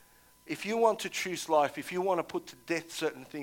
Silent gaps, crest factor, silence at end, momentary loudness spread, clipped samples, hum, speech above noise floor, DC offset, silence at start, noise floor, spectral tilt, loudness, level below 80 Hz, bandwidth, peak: none; 20 dB; 0 s; 10 LU; under 0.1%; none; 26 dB; under 0.1%; 0.45 s; -57 dBFS; -3.5 dB/octave; -32 LUFS; -72 dBFS; 17.5 kHz; -12 dBFS